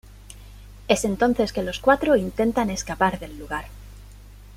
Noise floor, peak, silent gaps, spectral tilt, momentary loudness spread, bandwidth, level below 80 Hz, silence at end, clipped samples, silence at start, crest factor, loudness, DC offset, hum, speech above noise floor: -44 dBFS; -4 dBFS; none; -4.5 dB/octave; 20 LU; 16 kHz; -42 dBFS; 0 s; under 0.1%; 0.1 s; 20 dB; -23 LUFS; under 0.1%; 50 Hz at -40 dBFS; 21 dB